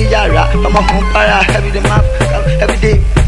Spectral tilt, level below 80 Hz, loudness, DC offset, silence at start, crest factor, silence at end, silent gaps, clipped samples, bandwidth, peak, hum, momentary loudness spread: -5.5 dB/octave; -14 dBFS; -11 LUFS; under 0.1%; 0 s; 10 dB; 0 s; none; under 0.1%; 11.5 kHz; 0 dBFS; none; 3 LU